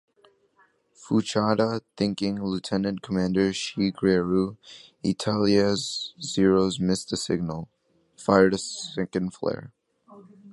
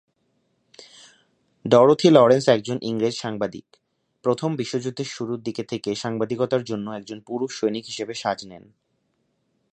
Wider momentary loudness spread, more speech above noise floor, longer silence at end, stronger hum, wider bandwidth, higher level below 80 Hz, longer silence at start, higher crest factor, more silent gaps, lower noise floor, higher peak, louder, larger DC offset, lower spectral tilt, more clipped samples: second, 10 LU vs 16 LU; second, 39 dB vs 49 dB; second, 0 s vs 1.15 s; neither; first, 11.5 kHz vs 9.6 kHz; first, -54 dBFS vs -66 dBFS; first, 1 s vs 0.8 s; about the same, 24 dB vs 22 dB; neither; second, -64 dBFS vs -71 dBFS; about the same, -2 dBFS vs 0 dBFS; second, -25 LUFS vs -22 LUFS; neither; about the same, -5.5 dB/octave vs -5.5 dB/octave; neither